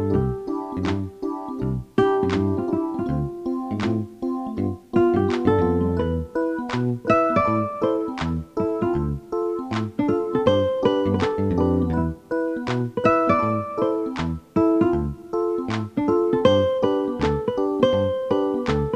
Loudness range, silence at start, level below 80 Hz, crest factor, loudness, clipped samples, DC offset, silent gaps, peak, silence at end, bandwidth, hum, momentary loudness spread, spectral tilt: 3 LU; 0 s; -40 dBFS; 20 dB; -23 LUFS; under 0.1%; under 0.1%; none; -2 dBFS; 0 s; 9.6 kHz; none; 8 LU; -8 dB/octave